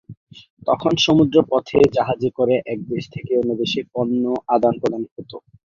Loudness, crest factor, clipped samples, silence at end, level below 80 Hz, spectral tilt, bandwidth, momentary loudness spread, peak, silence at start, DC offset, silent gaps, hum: -19 LUFS; 18 dB; under 0.1%; 0.35 s; -54 dBFS; -6 dB/octave; 7.4 kHz; 12 LU; -2 dBFS; 0.1 s; under 0.1%; 0.17-0.27 s, 0.50-0.57 s, 5.11-5.16 s; none